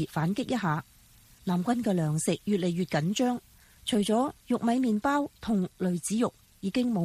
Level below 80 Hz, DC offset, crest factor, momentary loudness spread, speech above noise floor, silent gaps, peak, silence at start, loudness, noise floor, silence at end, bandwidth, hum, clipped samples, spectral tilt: -60 dBFS; under 0.1%; 14 dB; 6 LU; 29 dB; none; -14 dBFS; 0 s; -29 LUFS; -57 dBFS; 0 s; 15.5 kHz; none; under 0.1%; -5.5 dB/octave